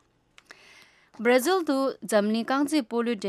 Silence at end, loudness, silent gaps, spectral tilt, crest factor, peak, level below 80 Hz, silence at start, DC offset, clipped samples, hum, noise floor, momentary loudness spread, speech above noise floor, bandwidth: 0 s; -25 LUFS; none; -4 dB/octave; 18 dB; -10 dBFS; -76 dBFS; 1.2 s; under 0.1%; under 0.1%; none; -60 dBFS; 5 LU; 35 dB; 15.5 kHz